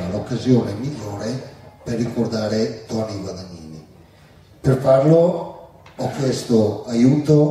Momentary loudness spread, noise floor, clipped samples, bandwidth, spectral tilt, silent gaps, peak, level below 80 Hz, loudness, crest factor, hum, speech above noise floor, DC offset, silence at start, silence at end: 19 LU; -48 dBFS; under 0.1%; 13.5 kHz; -7.5 dB/octave; none; -2 dBFS; -50 dBFS; -19 LUFS; 16 dB; none; 30 dB; under 0.1%; 0 s; 0 s